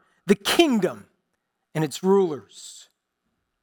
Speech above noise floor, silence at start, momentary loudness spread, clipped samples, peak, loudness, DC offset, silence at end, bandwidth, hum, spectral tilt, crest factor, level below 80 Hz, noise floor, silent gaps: 55 dB; 0.25 s; 22 LU; under 0.1%; -6 dBFS; -22 LUFS; under 0.1%; 0.85 s; 19 kHz; none; -5 dB/octave; 20 dB; -62 dBFS; -77 dBFS; none